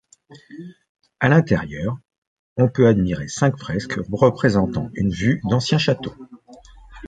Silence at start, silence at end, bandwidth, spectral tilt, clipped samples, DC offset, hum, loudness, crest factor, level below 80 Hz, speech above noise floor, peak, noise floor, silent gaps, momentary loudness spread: 0.3 s; 0 s; 9.2 kHz; -6.5 dB/octave; under 0.1%; under 0.1%; none; -20 LUFS; 18 dB; -44 dBFS; 26 dB; -2 dBFS; -45 dBFS; 0.89-0.95 s, 2.18-2.56 s; 15 LU